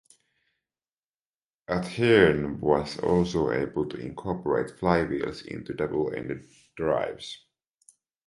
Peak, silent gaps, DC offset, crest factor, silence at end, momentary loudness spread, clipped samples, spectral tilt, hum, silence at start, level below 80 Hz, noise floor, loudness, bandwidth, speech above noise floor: -4 dBFS; none; under 0.1%; 22 dB; 0.9 s; 15 LU; under 0.1%; -6.5 dB/octave; none; 1.7 s; -50 dBFS; under -90 dBFS; -26 LUFS; 11.5 kHz; over 64 dB